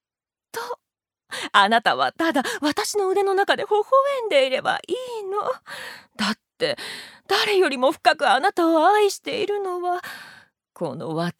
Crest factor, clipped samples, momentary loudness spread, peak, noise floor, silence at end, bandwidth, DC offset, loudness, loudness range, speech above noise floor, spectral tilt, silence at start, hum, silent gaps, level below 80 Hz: 22 dB; under 0.1%; 16 LU; 0 dBFS; under -90 dBFS; 0.1 s; 16.5 kHz; under 0.1%; -21 LUFS; 4 LU; over 69 dB; -3.5 dB/octave; 0.55 s; none; none; -72 dBFS